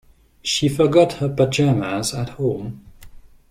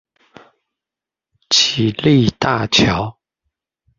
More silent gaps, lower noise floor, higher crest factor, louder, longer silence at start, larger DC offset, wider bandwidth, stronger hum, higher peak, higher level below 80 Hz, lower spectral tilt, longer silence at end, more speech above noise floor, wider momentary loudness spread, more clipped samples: neither; second, -42 dBFS vs -87 dBFS; about the same, 18 dB vs 18 dB; second, -19 LUFS vs -15 LUFS; second, 0.45 s vs 1.5 s; neither; first, 16 kHz vs 7.6 kHz; neither; about the same, -2 dBFS vs -2 dBFS; about the same, -48 dBFS vs -44 dBFS; first, -5.5 dB/octave vs -4 dB/octave; second, 0.25 s vs 0.9 s; second, 23 dB vs 72 dB; first, 12 LU vs 6 LU; neither